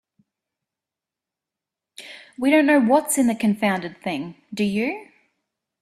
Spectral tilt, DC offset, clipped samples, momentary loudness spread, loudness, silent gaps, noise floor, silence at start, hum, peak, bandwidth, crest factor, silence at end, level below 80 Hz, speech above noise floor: -4.5 dB/octave; under 0.1%; under 0.1%; 22 LU; -21 LUFS; none; -88 dBFS; 2 s; none; -6 dBFS; 15.5 kHz; 18 dB; 0.8 s; -66 dBFS; 68 dB